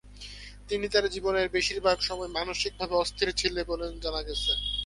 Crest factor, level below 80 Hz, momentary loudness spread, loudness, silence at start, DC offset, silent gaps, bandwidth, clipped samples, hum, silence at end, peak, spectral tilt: 20 dB; -44 dBFS; 8 LU; -28 LUFS; 0.05 s; under 0.1%; none; 11.5 kHz; under 0.1%; 50 Hz at -45 dBFS; 0 s; -10 dBFS; -3 dB/octave